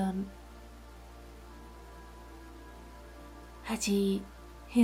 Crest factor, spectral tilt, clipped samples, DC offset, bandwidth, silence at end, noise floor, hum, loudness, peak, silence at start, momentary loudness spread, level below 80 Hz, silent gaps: 22 dB; -5 dB/octave; under 0.1%; under 0.1%; 16.5 kHz; 0 s; -50 dBFS; none; -33 LUFS; -14 dBFS; 0 s; 21 LU; -52 dBFS; none